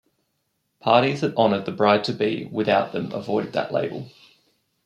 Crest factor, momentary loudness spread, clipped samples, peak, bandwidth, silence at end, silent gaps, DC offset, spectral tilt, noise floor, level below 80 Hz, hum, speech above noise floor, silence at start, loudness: 20 dB; 11 LU; under 0.1%; -2 dBFS; 10.5 kHz; 0.75 s; none; under 0.1%; -6.5 dB/octave; -73 dBFS; -68 dBFS; none; 52 dB; 0.85 s; -22 LUFS